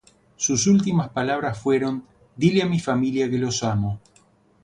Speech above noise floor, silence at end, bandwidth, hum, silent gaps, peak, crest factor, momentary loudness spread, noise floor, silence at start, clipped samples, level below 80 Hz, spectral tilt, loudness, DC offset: 37 dB; 0.65 s; 10.5 kHz; none; none; -4 dBFS; 18 dB; 8 LU; -58 dBFS; 0.4 s; under 0.1%; -52 dBFS; -5 dB/octave; -22 LUFS; under 0.1%